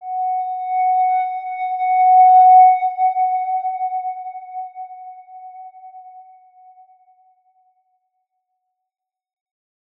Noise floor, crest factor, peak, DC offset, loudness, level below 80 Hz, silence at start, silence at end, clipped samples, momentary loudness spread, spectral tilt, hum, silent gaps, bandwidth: -75 dBFS; 16 dB; -4 dBFS; under 0.1%; -15 LUFS; under -90 dBFS; 0 s; 3.8 s; under 0.1%; 25 LU; -2 dB/octave; none; none; 3.9 kHz